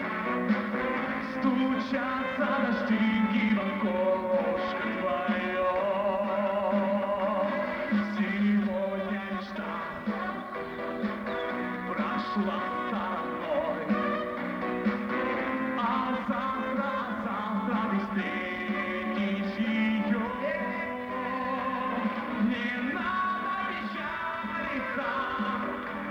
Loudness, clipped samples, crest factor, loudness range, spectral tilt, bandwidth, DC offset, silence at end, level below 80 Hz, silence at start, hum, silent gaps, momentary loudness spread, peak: -30 LUFS; under 0.1%; 16 dB; 4 LU; -7.5 dB/octave; 6.6 kHz; under 0.1%; 0 s; -60 dBFS; 0 s; none; none; 6 LU; -14 dBFS